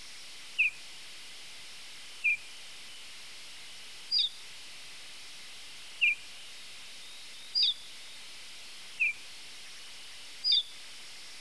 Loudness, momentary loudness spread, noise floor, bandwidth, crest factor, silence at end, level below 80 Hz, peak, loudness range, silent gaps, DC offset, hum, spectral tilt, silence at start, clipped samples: -29 LUFS; 18 LU; -48 dBFS; 11 kHz; 20 dB; 0 s; -76 dBFS; -18 dBFS; 4 LU; none; 0.4%; none; 2 dB/octave; 0 s; under 0.1%